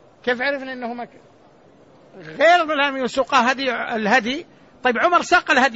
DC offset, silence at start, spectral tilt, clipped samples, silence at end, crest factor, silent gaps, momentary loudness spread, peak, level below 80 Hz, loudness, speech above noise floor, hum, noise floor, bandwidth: under 0.1%; 0.25 s; -3 dB/octave; under 0.1%; 0 s; 16 dB; none; 14 LU; -4 dBFS; -58 dBFS; -19 LUFS; 31 dB; none; -51 dBFS; 8 kHz